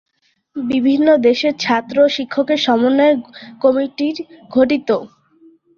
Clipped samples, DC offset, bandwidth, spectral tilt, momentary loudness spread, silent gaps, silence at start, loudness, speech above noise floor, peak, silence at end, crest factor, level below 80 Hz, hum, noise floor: under 0.1%; under 0.1%; 7.2 kHz; -5 dB/octave; 9 LU; none; 0.55 s; -16 LUFS; 34 dB; -2 dBFS; 0.7 s; 14 dB; -60 dBFS; none; -50 dBFS